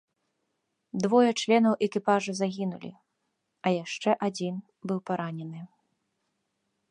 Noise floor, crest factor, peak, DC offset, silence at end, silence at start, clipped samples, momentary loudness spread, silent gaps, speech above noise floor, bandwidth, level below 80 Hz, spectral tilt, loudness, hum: -79 dBFS; 20 dB; -8 dBFS; under 0.1%; 1.25 s; 0.95 s; under 0.1%; 16 LU; none; 52 dB; 10.5 kHz; -78 dBFS; -5.5 dB/octave; -27 LUFS; none